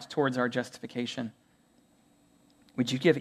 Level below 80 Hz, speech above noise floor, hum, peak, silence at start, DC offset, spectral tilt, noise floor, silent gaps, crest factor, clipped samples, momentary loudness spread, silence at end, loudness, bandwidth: -76 dBFS; 36 dB; none; -10 dBFS; 0 s; under 0.1%; -5.5 dB/octave; -65 dBFS; none; 22 dB; under 0.1%; 13 LU; 0 s; -31 LUFS; 13.5 kHz